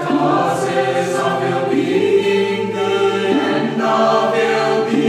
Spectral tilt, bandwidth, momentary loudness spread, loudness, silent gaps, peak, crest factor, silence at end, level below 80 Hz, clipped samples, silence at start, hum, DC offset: -5.5 dB/octave; 14 kHz; 3 LU; -16 LUFS; none; -2 dBFS; 12 dB; 0 s; -60 dBFS; under 0.1%; 0 s; none; under 0.1%